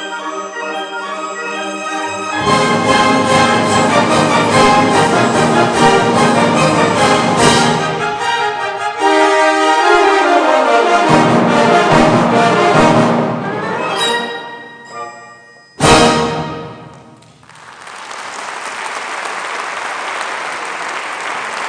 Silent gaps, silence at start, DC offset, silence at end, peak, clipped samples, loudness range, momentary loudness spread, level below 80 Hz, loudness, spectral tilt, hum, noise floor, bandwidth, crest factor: none; 0 s; under 0.1%; 0 s; 0 dBFS; under 0.1%; 11 LU; 13 LU; -40 dBFS; -12 LUFS; -4 dB/octave; none; -41 dBFS; 10.5 kHz; 14 dB